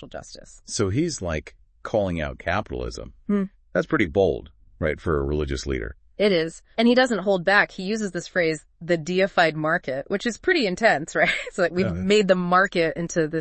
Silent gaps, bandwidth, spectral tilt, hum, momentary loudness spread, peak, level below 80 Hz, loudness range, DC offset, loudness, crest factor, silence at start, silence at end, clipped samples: none; 8.8 kHz; -5 dB/octave; none; 13 LU; -4 dBFS; -42 dBFS; 5 LU; under 0.1%; -23 LUFS; 20 dB; 0 s; 0 s; under 0.1%